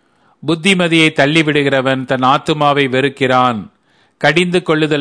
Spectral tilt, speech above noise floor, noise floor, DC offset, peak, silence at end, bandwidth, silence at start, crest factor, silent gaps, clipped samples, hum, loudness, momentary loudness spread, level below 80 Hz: -5 dB/octave; 35 dB; -47 dBFS; under 0.1%; 0 dBFS; 0 s; 10.5 kHz; 0.45 s; 14 dB; none; under 0.1%; none; -13 LUFS; 6 LU; -54 dBFS